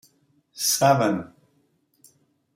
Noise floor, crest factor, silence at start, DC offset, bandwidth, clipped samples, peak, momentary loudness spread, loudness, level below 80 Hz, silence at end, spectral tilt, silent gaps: -67 dBFS; 22 dB; 0.55 s; under 0.1%; 16.5 kHz; under 0.1%; -4 dBFS; 14 LU; -21 LUFS; -70 dBFS; 1.3 s; -3.5 dB/octave; none